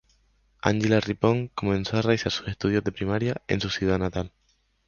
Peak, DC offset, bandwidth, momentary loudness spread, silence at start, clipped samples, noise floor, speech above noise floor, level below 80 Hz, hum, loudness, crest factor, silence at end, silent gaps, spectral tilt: -4 dBFS; under 0.1%; 7.2 kHz; 6 LU; 0.65 s; under 0.1%; -64 dBFS; 40 dB; -46 dBFS; none; -26 LUFS; 22 dB; 0.6 s; none; -6 dB/octave